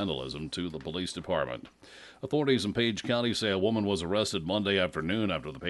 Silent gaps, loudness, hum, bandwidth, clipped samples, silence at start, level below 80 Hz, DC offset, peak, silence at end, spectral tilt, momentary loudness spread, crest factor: none; -30 LUFS; none; 11.5 kHz; under 0.1%; 0 s; -56 dBFS; under 0.1%; -12 dBFS; 0 s; -5 dB/octave; 9 LU; 18 dB